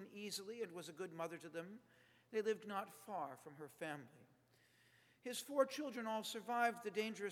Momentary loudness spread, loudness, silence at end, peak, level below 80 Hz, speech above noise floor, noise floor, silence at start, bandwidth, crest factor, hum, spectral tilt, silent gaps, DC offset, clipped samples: 14 LU; -45 LUFS; 0 s; -22 dBFS; under -90 dBFS; 29 dB; -74 dBFS; 0 s; 19 kHz; 24 dB; none; -3.5 dB/octave; none; under 0.1%; under 0.1%